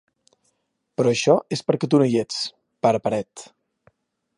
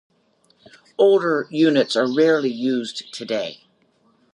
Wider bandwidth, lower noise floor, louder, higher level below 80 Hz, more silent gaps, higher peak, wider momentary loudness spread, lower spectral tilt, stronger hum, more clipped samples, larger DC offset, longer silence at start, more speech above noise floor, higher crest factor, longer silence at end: about the same, 11 kHz vs 11 kHz; first, -73 dBFS vs -61 dBFS; about the same, -21 LUFS vs -19 LUFS; first, -66 dBFS vs -76 dBFS; neither; about the same, -2 dBFS vs -4 dBFS; about the same, 13 LU vs 14 LU; about the same, -5.5 dB/octave vs -5 dB/octave; neither; neither; neither; about the same, 1 s vs 1 s; first, 52 dB vs 43 dB; about the same, 20 dB vs 16 dB; first, 0.95 s vs 0.8 s